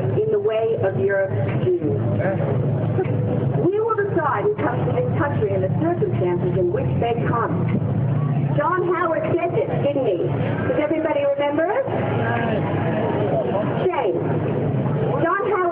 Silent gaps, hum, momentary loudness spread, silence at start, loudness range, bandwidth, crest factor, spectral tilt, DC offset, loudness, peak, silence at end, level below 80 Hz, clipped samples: none; none; 2 LU; 0 s; 1 LU; 3.9 kHz; 12 dB; -13 dB/octave; under 0.1%; -21 LUFS; -8 dBFS; 0 s; -52 dBFS; under 0.1%